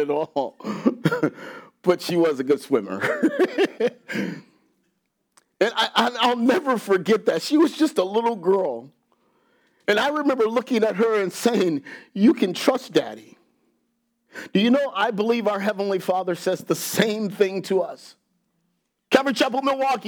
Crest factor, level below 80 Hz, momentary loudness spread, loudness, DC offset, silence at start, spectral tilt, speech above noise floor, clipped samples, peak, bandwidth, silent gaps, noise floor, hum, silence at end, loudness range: 22 dB; -78 dBFS; 9 LU; -22 LUFS; under 0.1%; 0 s; -5 dB/octave; 51 dB; under 0.1%; -2 dBFS; over 20 kHz; none; -73 dBFS; none; 0 s; 3 LU